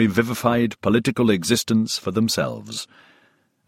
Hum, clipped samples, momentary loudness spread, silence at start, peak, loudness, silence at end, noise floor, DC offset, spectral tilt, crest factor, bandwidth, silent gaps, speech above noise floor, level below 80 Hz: none; under 0.1%; 12 LU; 0 s; -4 dBFS; -21 LUFS; 0.85 s; -61 dBFS; under 0.1%; -4.5 dB/octave; 18 dB; 16.5 kHz; none; 40 dB; -54 dBFS